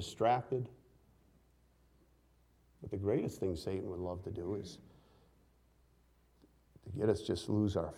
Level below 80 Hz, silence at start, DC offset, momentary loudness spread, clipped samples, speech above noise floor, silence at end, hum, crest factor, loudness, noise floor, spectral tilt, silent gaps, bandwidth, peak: -62 dBFS; 0 s; under 0.1%; 15 LU; under 0.1%; 33 dB; 0 s; none; 22 dB; -37 LUFS; -69 dBFS; -7 dB/octave; none; 15 kHz; -18 dBFS